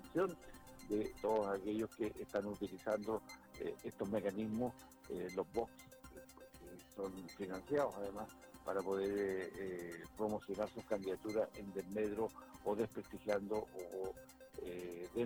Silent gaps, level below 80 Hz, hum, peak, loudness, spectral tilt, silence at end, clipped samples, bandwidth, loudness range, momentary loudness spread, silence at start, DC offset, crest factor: none; -68 dBFS; none; -20 dBFS; -43 LUFS; -6 dB/octave; 0 s; under 0.1%; over 20 kHz; 3 LU; 16 LU; 0 s; under 0.1%; 22 dB